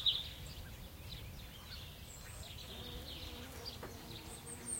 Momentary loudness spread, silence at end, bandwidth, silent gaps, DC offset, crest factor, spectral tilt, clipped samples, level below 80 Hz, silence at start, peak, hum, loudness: 4 LU; 0 s; 16.5 kHz; none; under 0.1%; 26 dB; -2.5 dB/octave; under 0.1%; -56 dBFS; 0 s; -20 dBFS; none; -46 LUFS